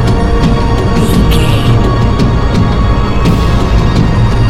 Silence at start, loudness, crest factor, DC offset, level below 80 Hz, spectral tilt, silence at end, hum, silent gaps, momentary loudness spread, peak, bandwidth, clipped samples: 0 s; -10 LUFS; 8 dB; under 0.1%; -12 dBFS; -7 dB/octave; 0 s; none; none; 2 LU; 0 dBFS; 14 kHz; 0.4%